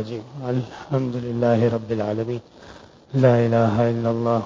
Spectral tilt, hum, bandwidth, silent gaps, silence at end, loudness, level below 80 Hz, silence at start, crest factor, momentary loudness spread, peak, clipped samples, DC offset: -8.5 dB/octave; none; 7.6 kHz; none; 0 s; -22 LUFS; -54 dBFS; 0 s; 18 dB; 11 LU; -4 dBFS; under 0.1%; under 0.1%